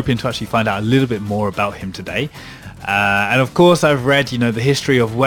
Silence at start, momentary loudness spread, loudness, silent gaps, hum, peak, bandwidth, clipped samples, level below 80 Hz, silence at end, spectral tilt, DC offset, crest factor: 0 s; 12 LU; -16 LUFS; none; none; -2 dBFS; 19 kHz; under 0.1%; -44 dBFS; 0 s; -5.5 dB/octave; under 0.1%; 14 dB